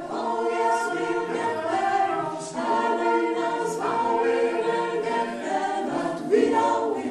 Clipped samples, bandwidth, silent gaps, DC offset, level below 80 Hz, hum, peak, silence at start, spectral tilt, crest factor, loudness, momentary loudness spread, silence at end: under 0.1%; 12.5 kHz; none; under 0.1%; -68 dBFS; none; -8 dBFS; 0 s; -4.5 dB/octave; 16 dB; -25 LUFS; 5 LU; 0 s